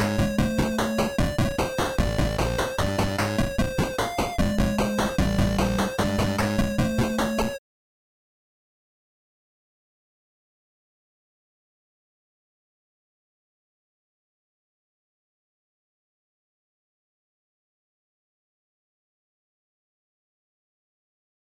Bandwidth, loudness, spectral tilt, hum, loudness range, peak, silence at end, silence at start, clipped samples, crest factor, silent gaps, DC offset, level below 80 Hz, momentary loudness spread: 19 kHz; -25 LUFS; -5.5 dB/octave; none; 6 LU; -12 dBFS; 13.95 s; 0 s; under 0.1%; 16 dB; none; under 0.1%; -38 dBFS; 2 LU